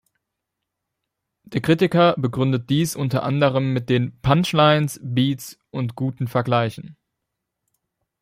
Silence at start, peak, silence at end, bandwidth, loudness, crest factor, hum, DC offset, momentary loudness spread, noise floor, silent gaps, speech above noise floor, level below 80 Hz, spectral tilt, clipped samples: 1.5 s; -2 dBFS; 1.3 s; 15.5 kHz; -20 LUFS; 20 dB; none; under 0.1%; 12 LU; -81 dBFS; none; 61 dB; -52 dBFS; -6.5 dB/octave; under 0.1%